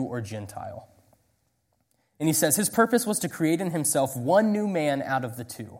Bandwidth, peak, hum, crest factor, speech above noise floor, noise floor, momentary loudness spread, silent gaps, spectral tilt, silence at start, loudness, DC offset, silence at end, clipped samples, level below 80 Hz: 16.5 kHz; -6 dBFS; none; 20 dB; 47 dB; -72 dBFS; 15 LU; none; -4.5 dB/octave; 0 s; -24 LUFS; under 0.1%; 0 s; under 0.1%; -66 dBFS